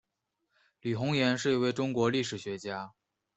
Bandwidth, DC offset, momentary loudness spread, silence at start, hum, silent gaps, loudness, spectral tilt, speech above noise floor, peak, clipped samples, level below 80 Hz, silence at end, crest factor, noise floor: 8.2 kHz; under 0.1%; 12 LU; 0.85 s; none; none; -31 LUFS; -5.5 dB/octave; 53 dB; -14 dBFS; under 0.1%; -70 dBFS; 0.45 s; 18 dB; -83 dBFS